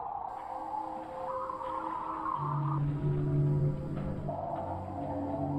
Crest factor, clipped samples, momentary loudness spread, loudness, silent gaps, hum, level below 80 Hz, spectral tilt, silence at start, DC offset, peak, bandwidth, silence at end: 14 dB; under 0.1%; 9 LU; -35 LUFS; none; none; -50 dBFS; -10 dB/octave; 0 s; under 0.1%; -20 dBFS; 4.9 kHz; 0 s